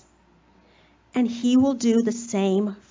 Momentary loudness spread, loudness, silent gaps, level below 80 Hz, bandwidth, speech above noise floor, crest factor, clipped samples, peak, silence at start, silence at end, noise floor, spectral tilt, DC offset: 6 LU; -22 LUFS; none; -60 dBFS; 7.6 kHz; 37 dB; 14 dB; under 0.1%; -10 dBFS; 1.15 s; 0.15 s; -58 dBFS; -5.5 dB/octave; under 0.1%